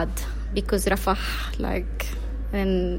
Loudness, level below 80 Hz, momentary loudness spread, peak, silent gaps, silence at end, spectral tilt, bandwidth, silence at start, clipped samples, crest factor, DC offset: -27 LUFS; -28 dBFS; 8 LU; -8 dBFS; none; 0 s; -5 dB/octave; 16.5 kHz; 0 s; under 0.1%; 16 dB; under 0.1%